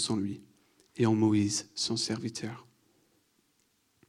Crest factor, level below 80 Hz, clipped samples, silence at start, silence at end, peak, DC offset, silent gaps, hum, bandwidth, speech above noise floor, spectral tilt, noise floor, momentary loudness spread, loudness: 18 dB; -72 dBFS; under 0.1%; 0 s; 1.45 s; -14 dBFS; under 0.1%; none; none; 12.5 kHz; 43 dB; -4.5 dB/octave; -72 dBFS; 19 LU; -30 LUFS